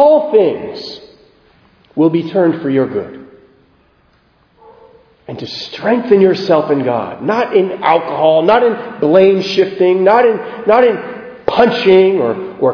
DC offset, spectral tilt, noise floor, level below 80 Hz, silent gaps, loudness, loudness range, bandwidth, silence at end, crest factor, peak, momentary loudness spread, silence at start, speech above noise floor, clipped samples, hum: under 0.1%; -7 dB/octave; -53 dBFS; -54 dBFS; none; -12 LUFS; 9 LU; 5.4 kHz; 0 s; 14 dB; 0 dBFS; 14 LU; 0 s; 41 dB; 0.1%; none